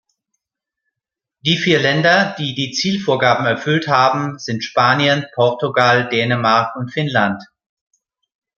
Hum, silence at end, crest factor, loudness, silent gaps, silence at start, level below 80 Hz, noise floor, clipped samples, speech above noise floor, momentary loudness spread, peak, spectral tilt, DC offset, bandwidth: none; 1.15 s; 18 dB; -16 LUFS; none; 1.45 s; -60 dBFS; -84 dBFS; under 0.1%; 68 dB; 8 LU; 0 dBFS; -5 dB/octave; under 0.1%; 7.4 kHz